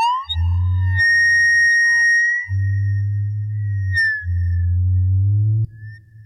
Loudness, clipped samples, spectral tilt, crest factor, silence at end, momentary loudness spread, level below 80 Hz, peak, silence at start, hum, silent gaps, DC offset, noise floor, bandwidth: -16 LUFS; under 0.1%; -3 dB/octave; 6 dB; 0 s; 11 LU; -34 dBFS; -10 dBFS; 0 s; none; none; under 0.1%; -37 dBFS; 9.8 kHz